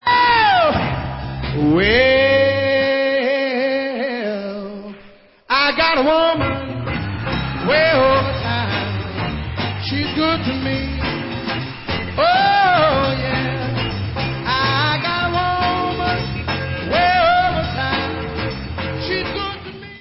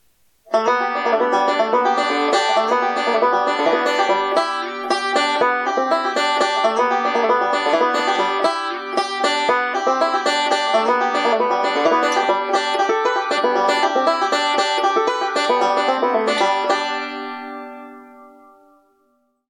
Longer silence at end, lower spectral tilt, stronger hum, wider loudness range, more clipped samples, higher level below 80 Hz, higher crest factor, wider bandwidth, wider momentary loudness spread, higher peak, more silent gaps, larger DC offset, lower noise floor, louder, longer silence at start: second, 0 s vs 1.2 s; first, -9.5 dB/octave vs -2 dB/octave; neither; about the same, 3 LU vs 2 LU; neither; first, -34 dBFS vs -78 dBFS; about the same, 16 dB vs 12 dB; second, 5.8 kHz vs 13.5 kHz; first, 11 LU vs 5 LU; first, -2 dBFS vs -6 dBFS; neither; neither; second, -45 dBFS vs -64 dBFS; about the same, -18 LUFS vs -18 LUFS; second, 0.05 s vs 0.5 s